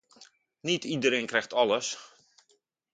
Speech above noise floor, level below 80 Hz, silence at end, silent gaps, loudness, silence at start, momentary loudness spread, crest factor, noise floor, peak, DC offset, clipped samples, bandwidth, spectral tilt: 43 dB; -76 dBFS; 0.85 s; none; -28 LUFS; 0.2 s; 11 LU; 22 dB; -71 dBFS; -8 dBFS; under 0.1%; under 0.1%; 9.4 kHz; -3 dB/octave